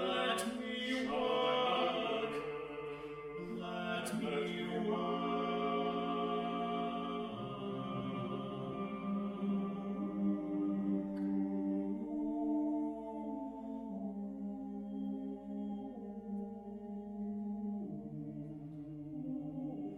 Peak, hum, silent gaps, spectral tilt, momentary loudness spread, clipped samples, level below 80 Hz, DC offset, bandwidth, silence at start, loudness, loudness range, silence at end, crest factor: -22 dBFS; none; none; -6 dB/octave; 10 LU; under 0.1%; -68 dBFS; under 0.1%; 14 kHz; 0 s; -39 LUFS; 7 LU; 0 s; 18 dB